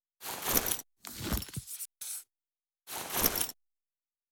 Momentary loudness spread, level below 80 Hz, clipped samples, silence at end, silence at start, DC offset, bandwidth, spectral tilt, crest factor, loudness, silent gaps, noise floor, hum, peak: 14 LU; -50 dBFS; under 0.1%; 0.8 s; 0.2 s; under 0.1%; over 20 kHz; -2 dB/octave; 28 dB; -33 LUFS; none; under -90 dBFS; none; -10 dBFS